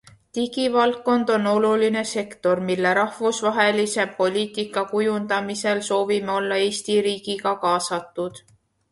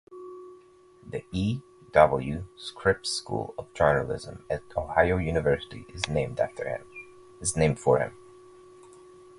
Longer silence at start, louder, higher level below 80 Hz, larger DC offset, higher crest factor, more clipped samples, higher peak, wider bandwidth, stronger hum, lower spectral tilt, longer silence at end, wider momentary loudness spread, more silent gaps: first, 0.35 s vs 0.1 s; first, -22 LUFS vs -27 LUFS; second, -66 dBFS vs -46 dBFS; neither; second, 16 dB vs 26 dB; neither; about the same, -6 dBFS vs -4 dBFS; about the same, 11.5 kHz vs 11.5 kHz; neither; about the same, -4 dB/octave vs -5 dB/octave; second, 0.55 s vs 1.25 s; second, 7 LU vs 16 LU; neither